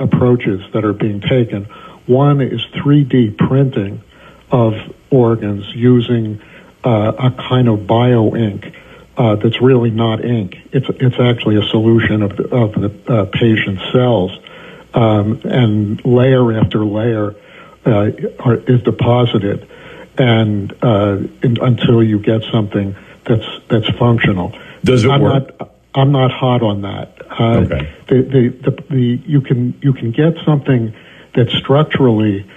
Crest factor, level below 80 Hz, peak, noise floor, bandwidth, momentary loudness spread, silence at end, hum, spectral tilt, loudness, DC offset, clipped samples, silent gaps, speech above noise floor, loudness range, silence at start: 12 dB; -44 dBFS; 0 dBFS; -36 dBFS; 8.2 kHz; 9 LU; 0.1 s; none; -8.5 dB/octave; -14 LUFS; under 0.1%; under 0.1%; none; 23 dB; 1 LU; 0 s